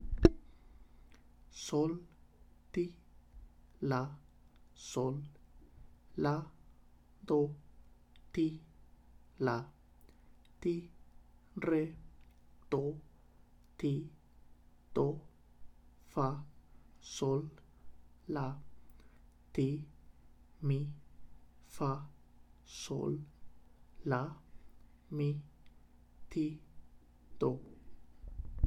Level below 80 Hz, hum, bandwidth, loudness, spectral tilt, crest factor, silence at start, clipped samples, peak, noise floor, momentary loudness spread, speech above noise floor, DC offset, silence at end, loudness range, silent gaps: -52 dBFS; 60 Hz at -70 dBFS; 13 kHz; -38 LUFS; -7 dB/octave; 34 dB; 0 s; under 0.1%; -6 dBFS; -62 dBFS; 20 LU; 26 dB; under 0.1%; 0 s; 4 LU; none